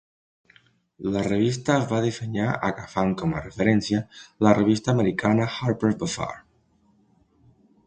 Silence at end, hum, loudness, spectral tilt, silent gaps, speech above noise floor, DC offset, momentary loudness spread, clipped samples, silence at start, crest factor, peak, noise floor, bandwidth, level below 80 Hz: 1.5 s; none; -24 LUFS; -6.5 dB/octave; none; 40 dB; under 0.1%; 8 LU; under 0.1%; 1 s; 22 dB; -2 dBFS; -63 dBFS; 9.4 kHz; -52 dBFS